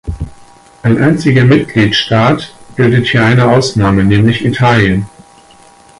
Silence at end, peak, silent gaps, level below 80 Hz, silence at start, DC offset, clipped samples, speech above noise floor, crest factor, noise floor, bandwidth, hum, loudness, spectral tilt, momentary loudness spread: 0.9 s; 0 dBFS; none; -32 dBFS; 0.05 s; under 0.1%; under 0.1%; 32 dB; 10 dB; -41 dBFS; 11.5 kHz; none; -10 LUFS; -6.5 dB/octave; 11 LU